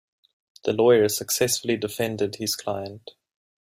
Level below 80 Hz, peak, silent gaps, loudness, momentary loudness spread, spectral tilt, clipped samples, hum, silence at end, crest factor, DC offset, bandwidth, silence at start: -64 dBFS; -6 dBFS; none; -23 LUFS; 14 LU; -3.5 dB/octave; under 0.1%; none; 0.5 s; 18 dB; under 0.1%; 16 kHz; 0.65 s